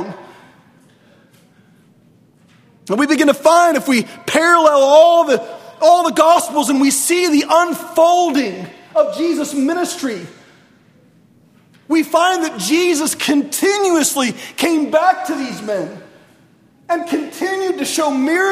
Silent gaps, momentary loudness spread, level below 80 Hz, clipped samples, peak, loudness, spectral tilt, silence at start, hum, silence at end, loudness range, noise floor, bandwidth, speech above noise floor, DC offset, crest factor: none; 12 LU; -64 dBFS; under 0.1%; 0 dBFS; -14 LUFS; -3 dB/octave; 0 s; none; 0 s; 9 LU; -51 dBFS; 16 kHz; 37 dB; under 0.1%; 16 dB